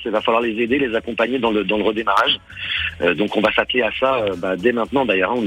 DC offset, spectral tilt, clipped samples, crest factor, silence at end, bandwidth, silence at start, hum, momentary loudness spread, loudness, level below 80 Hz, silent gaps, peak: under 0.1%; -5.5 dB/octave; under 0.1%; 16 dB; 0 s; 16.5 kHz; 0 s; none; 5 LU; -19 LUFS; -48 dBFS; none; -2 dBFS